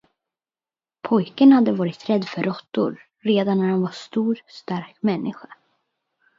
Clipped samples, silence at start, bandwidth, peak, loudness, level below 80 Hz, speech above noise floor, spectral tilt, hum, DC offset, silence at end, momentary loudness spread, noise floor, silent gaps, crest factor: under 0.1%; 1.05 s; 7.6 kHz; -4 dBFS; -21 LUFS; -70 dBFS; over 70 dB; -8 dB/octave; none; under 0.1%; 1.05 s; 15 LU; under -90 dBFS; none; 18 dB